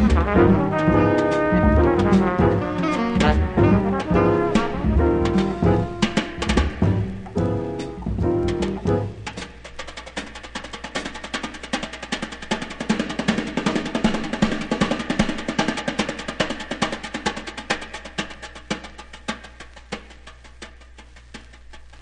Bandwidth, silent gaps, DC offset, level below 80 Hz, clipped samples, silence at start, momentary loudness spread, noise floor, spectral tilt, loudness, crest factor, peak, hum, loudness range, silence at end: 10.5 kHz; none; under 0.1%; -32 dBFS; under 0.1%; 0 s; 17 LU; -44 dBFS; -6 dB/octave; -22 LUFS; 18 dB; -2 dBFS; none; 12 LU; 0.05 s